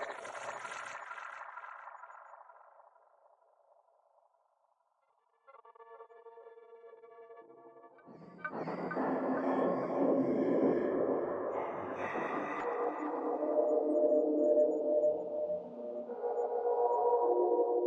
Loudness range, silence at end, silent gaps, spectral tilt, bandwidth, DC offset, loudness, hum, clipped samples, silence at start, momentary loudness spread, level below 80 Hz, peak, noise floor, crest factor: 18 LU; 0 s; none; -7 dB/octave; 10.5 kHz; under 0.1%; -34 LUFS; none; under 0.1%; 0 s; 24 LU; -82 dBFS; -18 dBFS; -76 dBFS; 16 dB